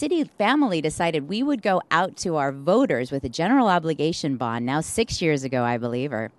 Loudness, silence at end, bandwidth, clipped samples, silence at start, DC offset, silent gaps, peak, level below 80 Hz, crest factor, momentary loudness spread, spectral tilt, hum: -23 LUFS; 0.1 s; 12.5 kHz; under 0.1%; 0 s; under 0.1%; none; -4 dBFS; -52 dBFS; 18 dB; 6 LU; -5 dB/octave; none